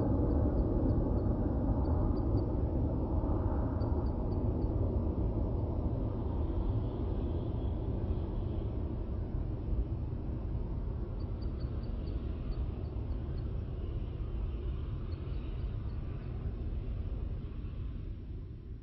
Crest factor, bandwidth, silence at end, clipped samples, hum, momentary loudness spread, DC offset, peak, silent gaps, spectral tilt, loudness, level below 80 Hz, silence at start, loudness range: 16 dB; 5 kHz; 0 s; under 0.1%; none; 8 LU; under 0.1%; -18 dBFS; none; -10.5 dB/octave; -36 LUFS; -38 dBFS; 0 s; 7 LU